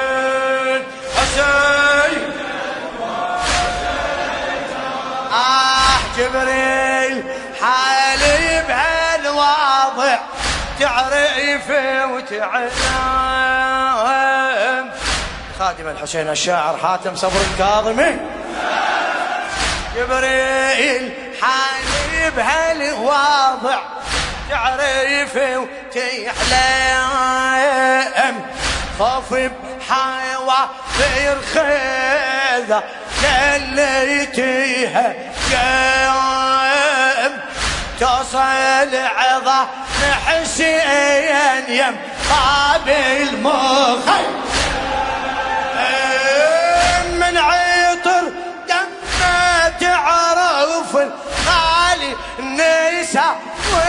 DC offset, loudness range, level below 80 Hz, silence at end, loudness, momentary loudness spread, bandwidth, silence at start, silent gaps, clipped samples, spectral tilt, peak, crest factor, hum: under 0.1%; 3 LU; -34 dBFS; 0 s; -16 LUFS; 8 LU; 11 kHz; 0 s; none; under 0.1%; -2.5 dB/octave; 0 dBFS; 16 dB; none